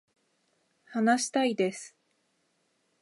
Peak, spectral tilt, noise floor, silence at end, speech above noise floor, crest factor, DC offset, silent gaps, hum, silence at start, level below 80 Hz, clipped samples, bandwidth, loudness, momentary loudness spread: -14 dBFS; -3.5 dB/octave; -74 dBFS; 1.15 s; 47 dB; 18 dB; under 0.1%; none; none; 0.9 s; -86 dBFS; under 0.1%; 11.5 kHz; -28 LUFS; 17 LU